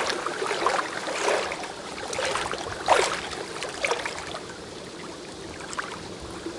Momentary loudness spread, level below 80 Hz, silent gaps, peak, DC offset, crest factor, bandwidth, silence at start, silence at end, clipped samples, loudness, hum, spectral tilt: 15 LU; -56 dBFS; none; -6 dBFS; under 0.1%; 24 dB; 11.5 kHz; 0 s; 0 s; under 0.1%; -29 LUFS; none; -2 dB/octave